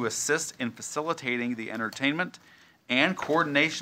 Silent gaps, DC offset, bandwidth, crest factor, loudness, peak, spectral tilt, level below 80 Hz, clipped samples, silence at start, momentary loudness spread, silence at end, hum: none; under 0.1%; 16 kHz; 22 dB; -28 LUFS; -6 dBFS; -3 dB/octave; -72 dBFS; under 0.1%; 0 s; 9 LU; 0 s; none